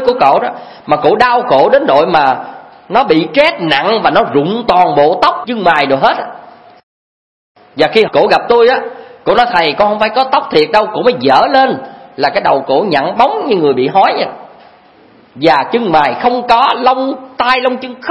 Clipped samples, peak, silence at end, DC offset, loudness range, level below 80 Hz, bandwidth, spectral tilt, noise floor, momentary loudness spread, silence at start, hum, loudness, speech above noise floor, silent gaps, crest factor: 0.3%; 0 dBFS; 0 s; 0.2%; 2 LU; -48 dBFS; 11 kHz; -6 dB/octave; -43 dBFS; 8 LU; 0 s; none; -11 LUFS; 33 dB; 6.83-7.55 s; 12 dB